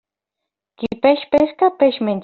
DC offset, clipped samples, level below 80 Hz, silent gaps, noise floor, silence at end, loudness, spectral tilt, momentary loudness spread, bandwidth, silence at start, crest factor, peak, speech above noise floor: under 0.1%; under 0.1%; -54 dBFS; none; -82 dBFS; 0 s; -16 LUFS; -4 dB/octave; 10 LU; 5.4 kHz; 0.8 s; 16 dB; -2 dBFS; 66 dB